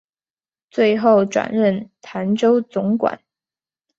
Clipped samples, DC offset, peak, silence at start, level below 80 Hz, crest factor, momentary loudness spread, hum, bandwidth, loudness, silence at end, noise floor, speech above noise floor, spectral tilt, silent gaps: under 0.1%; under 0.1%; -2 dBFS; 0.75 s; -64 dBFS; 16 dB; 13 LU; none; 7.8 kHz; -18 LUFS; 0.8 s; under -90 dBFS; over 73 dB; -6.5 dB/octave; none